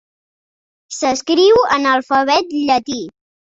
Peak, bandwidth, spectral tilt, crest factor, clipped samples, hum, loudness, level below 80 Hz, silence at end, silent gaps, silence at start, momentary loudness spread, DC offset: -2 dBFS; 8 kHz; -2.5 dB/octave; 16 dB; under 0.1%; none; -14 LUFS; -54 dBFS; 0.5 s; none; 0.9 s; 15 LU; under 0.1%